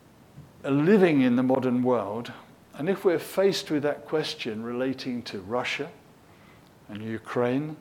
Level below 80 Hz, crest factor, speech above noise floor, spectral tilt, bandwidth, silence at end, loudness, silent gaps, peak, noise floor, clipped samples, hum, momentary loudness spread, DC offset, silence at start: -68 dBFS; 18 dB; 28 dB; -6 dB/octave; 17 kHz; 0.05 s; -26 LUFS; none; -8 dBFS; -53 dBFS; under 0.1%; none; 15 LU; under 0.1%; 0.35 s